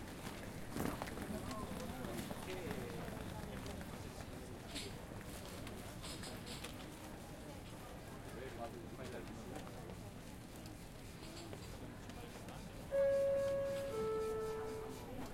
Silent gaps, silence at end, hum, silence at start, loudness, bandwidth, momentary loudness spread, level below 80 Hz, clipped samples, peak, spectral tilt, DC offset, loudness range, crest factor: none; 0 s; none; 0 s; -45 LUFS; 16.5 kHz; 12 LU; -58 dBFS; under 0.1%; -26 dBFS; -5 dB/octave; under 0.1%; 10 LU; 18 dB